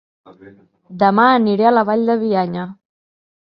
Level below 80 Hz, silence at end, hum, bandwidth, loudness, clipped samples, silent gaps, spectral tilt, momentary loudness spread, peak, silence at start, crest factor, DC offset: -64 dBFS; 0.85 s; none; 5.4 kHz; -15 LUFS; under 0.1%; none; -9.5 dB/octave; 11 LU; 0 dBFS; 0.45 s; 18 dB; under 0.1%